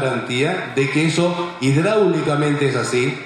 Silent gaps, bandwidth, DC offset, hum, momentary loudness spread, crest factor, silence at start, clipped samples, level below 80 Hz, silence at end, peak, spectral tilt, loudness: none; 12 kHz; under 0.1%; none; 4 LU; 14 dB; 0 s; under 0.1%; -58 dBFS; 0 s; -4 dBFS; -5.5 dB/octave; -18 LUFS